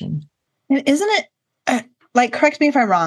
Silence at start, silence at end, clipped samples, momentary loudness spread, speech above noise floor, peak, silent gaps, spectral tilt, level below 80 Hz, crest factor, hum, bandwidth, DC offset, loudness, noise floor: 0 s; 0 s; under 0.1%; 12 LU; 32 dB; 0 dBFS; none; -4.5 dB/octave; -66 dBFS; 18 dB; none; 12.5 kHz; under 0.1%; -18 LUFS; -48 dBFS